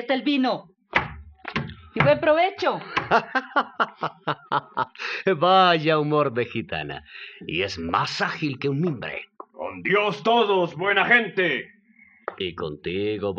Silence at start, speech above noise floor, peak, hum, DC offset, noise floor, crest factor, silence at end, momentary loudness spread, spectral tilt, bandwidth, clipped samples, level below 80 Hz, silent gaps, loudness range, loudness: 0 s; 32 dB; -4 dBFS; none; under 0.1%; -56 dBFS; 20 dB; 0 s; 16 LU; -6 dB/octave; 8 kHz; under 0.1%; -54 dBFS; none; 4 LU; -23 LUFS